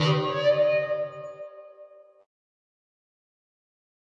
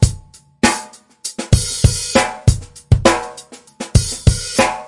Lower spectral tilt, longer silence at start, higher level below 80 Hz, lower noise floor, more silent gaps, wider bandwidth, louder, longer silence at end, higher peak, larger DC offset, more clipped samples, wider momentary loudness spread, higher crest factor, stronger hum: first, -6.5 dB/octave vs -4.5 dB/octave; about the same, 0 s vs 0 s; second, -76 dBFS vs -26 dBFS; first, -51 dBFS vs -38 dBFS; neither; second, 7.6 kHz vs 11.5 kHz; second, -25 LUFS vs -16 LUFS; first, 2.35 s vs 0 s; second, -12 dBFS vs 0 dBFS; neither; neither; first, 21 LU vs 17 LU; about the same, 18 dB vs 16 dB; neither